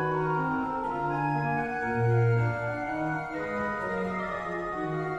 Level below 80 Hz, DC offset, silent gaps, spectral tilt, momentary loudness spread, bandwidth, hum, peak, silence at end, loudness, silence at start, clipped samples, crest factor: -54 dBFS; under 0.1%; none; -8.5 dB/octave; 7 LU; 8 kHz; none; -16 dBFS; 0 s; -29 LUFS; 0 s; under 0.1%; 14 dB